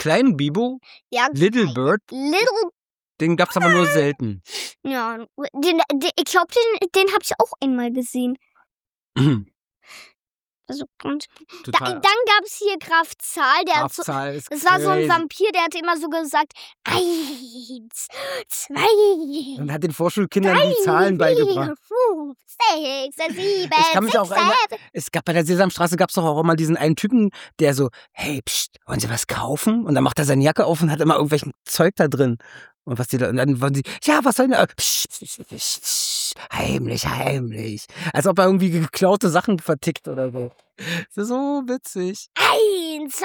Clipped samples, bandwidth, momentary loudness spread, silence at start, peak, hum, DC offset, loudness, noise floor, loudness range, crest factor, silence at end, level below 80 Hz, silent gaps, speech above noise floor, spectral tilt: under 0.1%; over 20 kHz; 12 LU; 0 s; -2 dBFS; none; under 0.1%; -20 LUFS; under -90 dBFS; 4 LU; 18 dB; 0 s; -56 dBFS; 10.35-10.39 s, 32.75-32.79 s; over 70 dB; -4.5 dB/octave